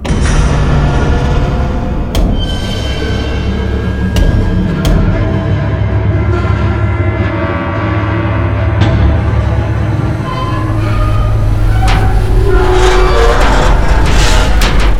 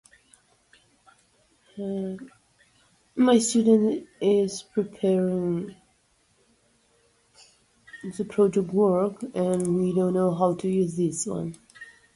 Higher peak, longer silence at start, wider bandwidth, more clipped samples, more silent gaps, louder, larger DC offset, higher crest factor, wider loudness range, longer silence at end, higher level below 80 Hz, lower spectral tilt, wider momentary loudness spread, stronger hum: first, 0 dBFS vs -8 dBFS; second, 0 s vs 1.75 s; first, 13.5 kHz vs 11.5 kHz; neither; neither; first, -12 LUFS vs -24 LUFS; neither; second, 10 dB vs 18 dB; second, 3 LU vs 8 LU; second, 0 s vs 0.3 s; first, -14 dBFS vs -64 dBFS; about the same, -6 dB/octave vs -6 dB/octave; second, 6 LU vs 18 LU; neither